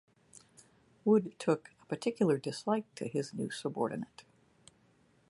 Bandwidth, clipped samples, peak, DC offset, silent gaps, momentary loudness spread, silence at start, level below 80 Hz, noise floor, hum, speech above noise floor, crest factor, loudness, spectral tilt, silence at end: 11.5 kHz; under 0.1%; -14 dBFS; under 0.1%; none; 9 LU; 0.35 s; -78 dBFS; -68 dBFS; none; 35 dB; 20 dB; -34 LUFS; -6 dB/octave; 1.1 s